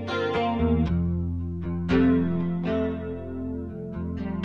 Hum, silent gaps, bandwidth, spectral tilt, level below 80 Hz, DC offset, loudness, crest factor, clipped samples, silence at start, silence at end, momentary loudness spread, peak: none; none; 6.6 kHz; -9 dB/octave; -40 dBFS; under 0.1%; -26 LUFS; 16 dB; under 0.1%; 0 s; 0 s; 11 LU; -10 dBFS